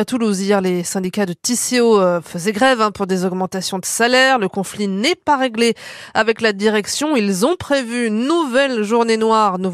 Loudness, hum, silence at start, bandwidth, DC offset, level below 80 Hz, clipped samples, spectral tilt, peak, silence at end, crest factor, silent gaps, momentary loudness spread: -17 LUFS; none; 0 s; 15 kHz; under 0.1%; -56 dBFS; under 0.1%; -4 dB/octave; -2 dBFS; 0 s; 14 dB; none; 8 LU